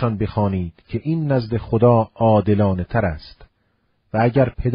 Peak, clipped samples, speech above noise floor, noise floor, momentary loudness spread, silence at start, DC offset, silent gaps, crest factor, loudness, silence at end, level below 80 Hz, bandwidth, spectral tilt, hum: -2 dBFS; under 0.1%; 47 dB; -66 dBFS; 11 LU; 0 s; under 0.1%; none; 16 dB; -19 LUFS; 0 s; -38 dBFS; 5.4 kHz; -12.5 dB/octave; none